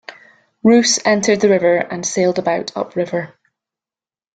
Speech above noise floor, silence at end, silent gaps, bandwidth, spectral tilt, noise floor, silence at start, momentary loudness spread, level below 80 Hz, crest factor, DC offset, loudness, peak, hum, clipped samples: over 75 dB; 1.1 s; none; 9.4 kHz; -3.5 dB/octave; under -90 dBFS; 0.1 s; 10 LU; -60 dBFS; 16 dB; under 0.1%; -16 LUFS; -2 dBFS; none; under 0.1%